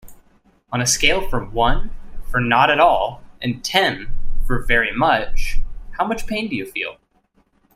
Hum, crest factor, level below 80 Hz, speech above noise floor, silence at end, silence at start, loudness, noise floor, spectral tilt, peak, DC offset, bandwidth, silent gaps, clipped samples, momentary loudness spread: none; 18 dB; -26 dBFS; 44 dB; 0.85 s; 0.05 s; -19 LUFS; -61 dBFS; -3 dB/octave; 0 dBFS; under 0.1%; 14.5 kHz; none; under 0.1%; 14 LU